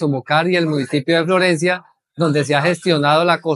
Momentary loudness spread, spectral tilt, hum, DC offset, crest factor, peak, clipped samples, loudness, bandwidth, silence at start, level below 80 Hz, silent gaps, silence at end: 5 LU; -5.5 dB/octave; none; under 0.1%; 16 dB; -2 dBFS; under 0.1%; -16 LUFS; 12 kHz; 0 s; -68 dBFS; none; 0 s